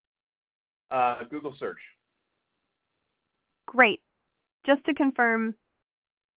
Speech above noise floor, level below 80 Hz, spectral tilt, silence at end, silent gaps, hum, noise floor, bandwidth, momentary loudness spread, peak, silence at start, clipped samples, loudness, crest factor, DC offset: 55 dB; -74 dBFS; -1.5 dB/octave; 0.85 s; 4.52-4.60 s; none; -80 dBFS; 4 kHz; 16 LU; -6 dBFS; 0.9 s; under 0.1%; -25 LUFS; 24 dB; under 0.1%